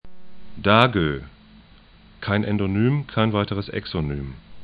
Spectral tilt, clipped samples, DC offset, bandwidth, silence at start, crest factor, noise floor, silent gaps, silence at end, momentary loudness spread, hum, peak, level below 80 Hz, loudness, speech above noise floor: -8.5 dB/octave; under 0.1%; under 0.1%; 5 kHz; 0.05 s; 24 dB; -50 dBFS; none; 0 s; 15 LU; none; 0 dBFS; -44 dBFS; -22 LUFS; 28 dB